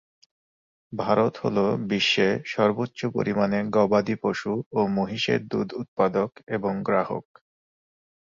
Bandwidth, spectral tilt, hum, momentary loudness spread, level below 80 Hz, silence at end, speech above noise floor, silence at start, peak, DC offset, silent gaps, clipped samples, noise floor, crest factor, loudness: 7.6 kHz; -6 dB/octave; none; 8 LU; -62 dBFS; 1.05 s; over 66 dB; 0.9 s; -6 dBFS; under 0.1%; 4.66-4.71 s, 5.88-5.97 s, 6.43-6.47 s; under 0.1%; under -90 dBFS; 20 dB; -25 LUFS